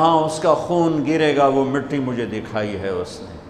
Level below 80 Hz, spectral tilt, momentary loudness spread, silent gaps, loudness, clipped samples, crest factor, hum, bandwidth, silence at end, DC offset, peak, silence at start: -50 dBFS; -6 dB/octave; 9 LU; none; -20 LUFS; under 0.1%; 18 dB; none; 12 kHz; 0 s; under 0.1%; -2 dBFS; 0 s